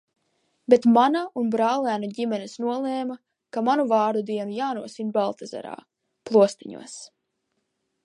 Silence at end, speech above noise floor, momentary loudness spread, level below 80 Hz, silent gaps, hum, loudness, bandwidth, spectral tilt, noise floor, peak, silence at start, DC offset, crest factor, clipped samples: 1 s; 53 dB; 19 LU; -78 dBFS; none; none; -23 LUFS; 11 kHz; -5.5 dB/octave; -76 dBFS; -2 dBFS; 0.7 s; under 0.1%; 22 dB; under 0.1%